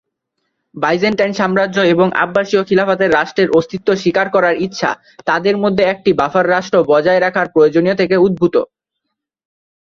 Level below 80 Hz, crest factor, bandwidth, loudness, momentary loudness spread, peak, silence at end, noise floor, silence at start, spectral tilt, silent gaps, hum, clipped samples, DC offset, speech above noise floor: -52 dBFS; 14 dB; 7.4 kHz; -14 LUFS; 5 LU; 0 dBFS; 1.25 s; -76 dBFS; 0.75 s; -6 dB/octave; none; none; under 0.1%; under 0.1%; 62 dB